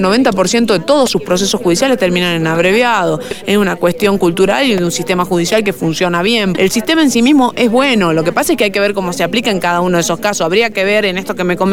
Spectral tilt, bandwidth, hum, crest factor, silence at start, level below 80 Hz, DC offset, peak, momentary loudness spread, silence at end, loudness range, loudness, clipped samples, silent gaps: -4.5 dB/octave; 19.5 kHz; none; 12 dB; 0 s; -42 dBFS; 2%; -2 dBFS; 4 LU; 0 s; 1 LU; -12 LUFS; under 0.1%; none